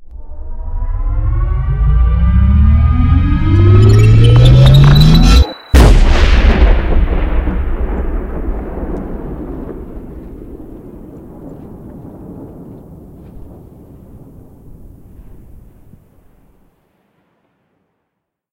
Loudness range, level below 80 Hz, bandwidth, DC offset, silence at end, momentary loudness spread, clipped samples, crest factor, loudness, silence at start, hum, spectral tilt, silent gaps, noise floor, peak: 24 LU; -14 dBFS; 12.5 kHz; under 0.1%; 3.3 s; 26 LU; 0.8%; 12 dB; -11 LUFS; 0 s; none; -7 dB/octave; none; -74 dBFS; 0 dBFS